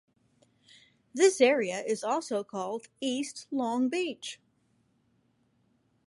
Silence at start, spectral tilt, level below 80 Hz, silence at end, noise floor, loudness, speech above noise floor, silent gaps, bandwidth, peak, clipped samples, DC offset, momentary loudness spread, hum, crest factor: 1.15 s; -3 dB/octave; -84 dBFS; 1.7 s; -71 dBFS; -29 LUFS; 42 dB; none; 11.5 kHz; -10 dBFS; under 0.1%; under 0.1%; 15 LU; none; 22 dB